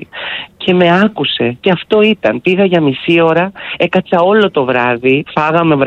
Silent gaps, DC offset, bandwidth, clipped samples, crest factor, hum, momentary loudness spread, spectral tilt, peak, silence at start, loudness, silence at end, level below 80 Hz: none; under 0.1%; 7.6 kHz; under 0.1%; 12 dB; none; 6 LU; -7.5 dB/octave; 0 dBFS; 0 s; -12 LUFS; 0 s; -50 dBFS